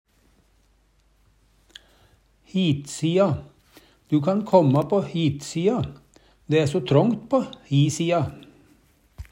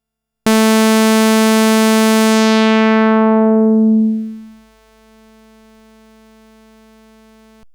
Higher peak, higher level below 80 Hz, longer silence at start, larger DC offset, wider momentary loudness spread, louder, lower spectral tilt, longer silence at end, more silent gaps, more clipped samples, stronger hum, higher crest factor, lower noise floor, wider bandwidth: about the same, -4 dBFS vs -2 dBFS; about the same, -54 dBFS vs -58 dBFS; first, 2.55 s vs 0.45 s; neither; first, 7 LU vs 4 LU; second, -23 LUFS vs -12 LUFS; first, -6.5 dB/octave vs -4.5 dB/octave; second, 0.1 s vs 3.25 s; neither; neither; second, none vs 50 Hz at -65 dBFS; first, 20 dB vs 12 dB; first, -62 dBFS vs -48 dBFS; second, 12 kHz vs over 20 kHz